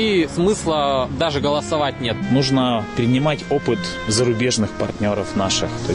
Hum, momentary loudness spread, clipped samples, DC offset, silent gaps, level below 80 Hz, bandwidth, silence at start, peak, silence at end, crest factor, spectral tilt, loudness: none; 4 LU; under 0.1%; under 0.1%; none; -42 dBFS; 11 kHz; 0 s; -8 dBFS; 0 s; 12 dB; -5 dB/octave; -19 LUFS